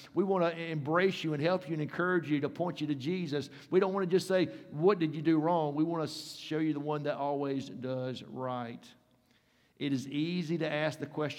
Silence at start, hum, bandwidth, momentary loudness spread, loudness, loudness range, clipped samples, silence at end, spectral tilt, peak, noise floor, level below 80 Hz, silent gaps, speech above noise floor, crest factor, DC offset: 0 s; none; 15.5 kHz; 9 LU; -32 LUFS; 7 LU; under 0.1%; 0 s; -6.5 dB/octave; -14 dBFS; -69 dBFS; -80 dBFS; none; 37 dB; 18 dB; under 0.1%